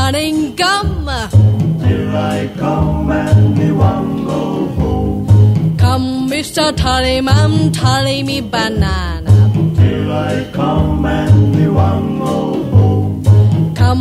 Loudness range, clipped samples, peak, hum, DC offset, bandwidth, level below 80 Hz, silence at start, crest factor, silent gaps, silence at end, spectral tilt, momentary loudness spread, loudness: 2 LU; under 0.1%; 0 dBFS; none; under 0.1%; 13.5 kHz; -26 dBFS; 0 s; 12 dB; none; 0 s; -6.5 dB/octave; 7 LU; -13 LUFS